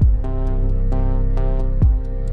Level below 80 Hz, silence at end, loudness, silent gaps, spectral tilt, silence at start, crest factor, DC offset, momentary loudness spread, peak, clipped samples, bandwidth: -16 dBFS; 0 s; -21 LUFS; none; -10.5 dB/octave; 0 s; 10 dB; under 0.1%; 4 LU; -6 dBFS; under 0.1%; 2.2 kHz